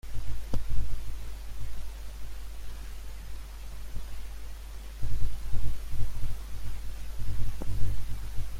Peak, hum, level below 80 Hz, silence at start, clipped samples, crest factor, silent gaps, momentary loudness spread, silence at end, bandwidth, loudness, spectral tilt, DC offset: -10 dBFS; none; -34 dBFS; 0.05 s; under 0.1%; 14 dB; none; 8 LU; 0 s; 14.5 kHz; -40 LUFS; -5.5 dB/octave; under 0.1%